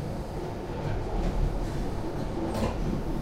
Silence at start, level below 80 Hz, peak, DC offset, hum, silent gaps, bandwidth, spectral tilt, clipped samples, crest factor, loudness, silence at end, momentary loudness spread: 0 s; -34 dBFS; -14 dBFS; under 0.1%; none; none; 15 kHz; -7 dB/octave; under 0.1%; 14 dB; -32 LUFS; 0 s; 5 LU